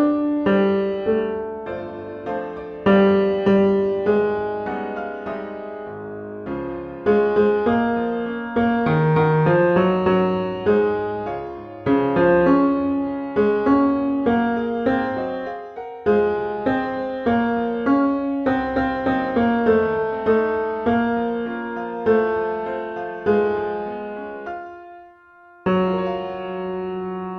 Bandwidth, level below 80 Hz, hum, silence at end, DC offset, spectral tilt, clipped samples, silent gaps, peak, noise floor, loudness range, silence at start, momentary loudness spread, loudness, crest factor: 5.8 kHz; -50 dBFS; none; 0 s; under 0.1%; -9.5 dB/octave; under 0.1%; none; -4 dBFS; -48 dBFS; 6 LU; 0 s; 13 LU; -21 LUFS; 16 dB